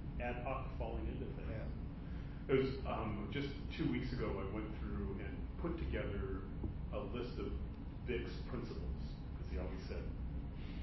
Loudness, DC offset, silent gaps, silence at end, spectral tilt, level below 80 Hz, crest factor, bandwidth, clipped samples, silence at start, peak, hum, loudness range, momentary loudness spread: -43 LUFS; under 0.1%; none; 0 s; -6.5 dB/octave; -46 dBFS; 20 dB; 5.8 kHz; under 0.1%; 0 s; -22 dBFS; none; 4 LU; 7 LU